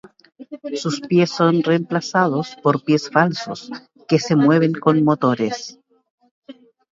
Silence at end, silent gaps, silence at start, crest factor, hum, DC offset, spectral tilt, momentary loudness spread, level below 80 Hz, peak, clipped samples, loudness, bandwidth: 0.4 s; 6.10-6.18 s, 6.31-6.42 s; 0.4 s; 18 dB; none; under 0.1%; -6.5 dB/octave; 16 LU; -66 dBFS; 0 dBFS; under 0.1%; -18 LUFS; 7.8 kHz